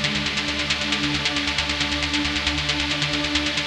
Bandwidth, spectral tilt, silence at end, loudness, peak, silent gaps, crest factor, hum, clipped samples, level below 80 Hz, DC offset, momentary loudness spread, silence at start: 13 kHz; -2.5 dB/octave; 0 s; -21 LUFS; -4 dBFS; none; 18 dB; none; under 0.1%; -38 dBFS; under 0.1%; 1 LU; 0 s